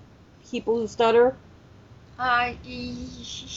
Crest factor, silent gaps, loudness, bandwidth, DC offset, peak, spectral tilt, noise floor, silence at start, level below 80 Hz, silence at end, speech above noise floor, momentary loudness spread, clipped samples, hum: 18 dB; none; -24 LUFS; 7.8 kHz; under 0.1%; -8 dBFS; -4 dB/octave; -51 dBFS; 0 s; -52 dBFS; 0 s; 26 dB; 17 LU; under 0.1%; none